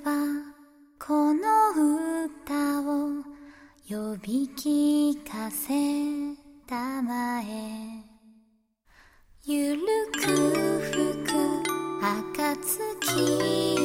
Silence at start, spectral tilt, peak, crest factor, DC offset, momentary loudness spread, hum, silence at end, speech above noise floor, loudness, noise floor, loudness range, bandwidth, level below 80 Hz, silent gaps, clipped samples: 0 s; -4 dB/octave; -12 dBFS; 16 dB; under 0.1%; 13 LU; none; 0 s; 38 dB; -27 LUFS; -66 dBFS; 6 LU; 16.5 kHz; -62 dBFS; none; under 0.1%